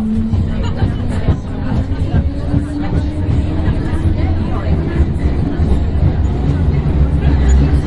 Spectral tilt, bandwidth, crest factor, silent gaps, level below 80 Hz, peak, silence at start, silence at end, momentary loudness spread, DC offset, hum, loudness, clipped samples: -8.5 dB/octave; 7.8 kHz; 14 dB; none; -18 dBFS; 0 dBFS; 0 s; 0 s; 4 LU; under 0.1%; none; -16 LUFS; under 0.1%